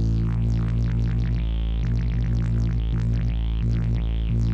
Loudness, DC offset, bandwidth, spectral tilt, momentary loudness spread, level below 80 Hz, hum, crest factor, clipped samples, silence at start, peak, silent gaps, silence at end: -25 LUFS; under 0.1%; 6.2 kHz; -8.5 dB/octave; 2 LU; -24 dBFS; none; 8 dB; under 0.1%; 0 s; -14 dBFS; none; 0 s